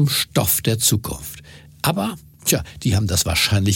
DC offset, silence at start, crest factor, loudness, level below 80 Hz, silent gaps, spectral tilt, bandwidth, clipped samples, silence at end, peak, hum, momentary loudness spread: under 0.1%; 0 s; 18 dB; -19 LUFS; -40 dBFS; none; -3.5 dB/octave; 17 kHz; under 0.1%; 0 s; -2 dBFS; none; 12 LU